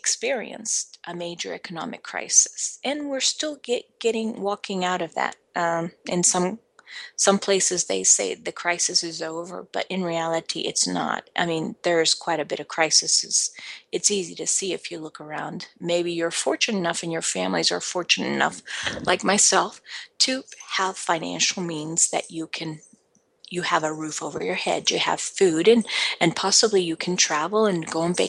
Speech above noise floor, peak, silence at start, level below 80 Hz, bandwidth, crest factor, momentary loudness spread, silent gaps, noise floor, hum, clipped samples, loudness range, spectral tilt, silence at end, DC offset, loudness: 40 dB; -4 dBFS; 0.05 s; -68 dBFS; 12 kHz; 22 dB; 14 LU; none; -64 dBFS; none; under 0.1%; 4 LU; -2 dB/octave; 0 s; under 0.1%; -23 LUFS